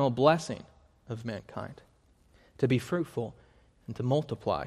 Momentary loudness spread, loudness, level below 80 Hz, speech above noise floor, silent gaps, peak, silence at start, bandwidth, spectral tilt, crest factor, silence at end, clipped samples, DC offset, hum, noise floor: 17 LU; -31 LUFS; -62 dBFS; 34 dB; none; -8 dBFS; 0 s; 14 kHz; -6.5 dB/octave; 24 dB; 0 s; under 0.1%; under 0.1%; none; -63 dBFS